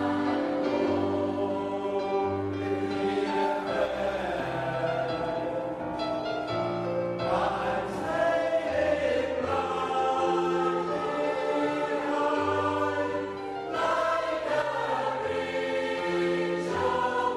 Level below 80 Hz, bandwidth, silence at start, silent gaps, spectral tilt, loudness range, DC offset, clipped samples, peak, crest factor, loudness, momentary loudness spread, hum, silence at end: -58 dBFS; 12.5 kHz; 0 s; none; -6 dB/octave; 3 LU; under 0.1%; under 0.1%; -14 dBFS; 14 dB; -28 LUFS; 4 LU; none; 0 s